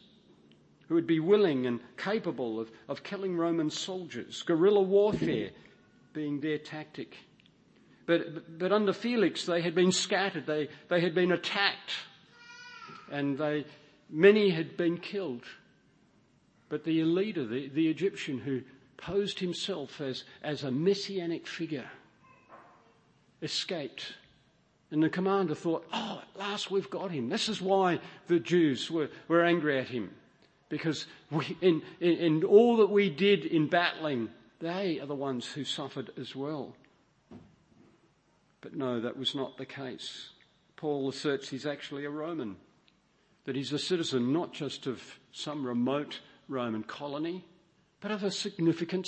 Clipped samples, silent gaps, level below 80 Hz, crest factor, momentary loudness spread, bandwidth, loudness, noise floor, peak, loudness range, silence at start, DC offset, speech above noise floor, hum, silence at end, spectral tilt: under 0.1%; none; -74 dBFS; 24 dB; 15 LU; 8.8 kHz; -31 LUFS; -69 dBFS; -8 dBFS; 10 LU; 0.9 s; under 0.1%; 39 dB; none; 0 s; -5 dB/octave